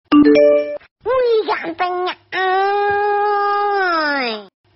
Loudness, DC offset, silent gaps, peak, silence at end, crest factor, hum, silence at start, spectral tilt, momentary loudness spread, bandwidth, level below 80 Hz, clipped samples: -16 LUFS; under 0.1%; 0.91-0.96 s; -2 dBFS; 0.3 s; 14 dB; none; 0.1 s; -1.5 dB/octave; 11 LU; 6 kHz; -54 dBFS; under 0.1%